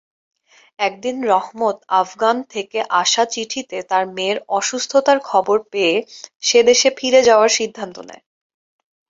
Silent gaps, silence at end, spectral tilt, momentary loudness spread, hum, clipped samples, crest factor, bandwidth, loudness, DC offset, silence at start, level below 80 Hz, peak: 6.35-6.40 s; 0.95 s; -1.5 dB/octave; 12 LU; none; under 0.1%; 16 dB; 7.8 kHz; -17 LUFS; under 0.1%; 0.8 s; -64 dBFS; -2 dBFS